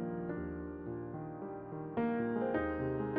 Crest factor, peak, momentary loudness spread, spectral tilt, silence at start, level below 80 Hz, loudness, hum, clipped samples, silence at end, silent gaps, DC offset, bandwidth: 14 dB; -22 dBFS; 9 LU; -7.5 dB/octave; 0 s; -56 dBFS; -38 LUFS; none; under 0.1%; 0 s; none; under 0.1%; 4.1 kHz